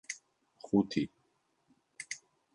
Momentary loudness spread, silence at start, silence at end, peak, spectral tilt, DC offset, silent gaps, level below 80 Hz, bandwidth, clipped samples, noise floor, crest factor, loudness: 17 LU; 0.1 s; 0.4 s; -16 dBFS; -5 dB/octave; under 0.1%; none; -70 dBFS; 11 kHz; under 0.1%; -76 dBFS; 22 dB; -35 LUFS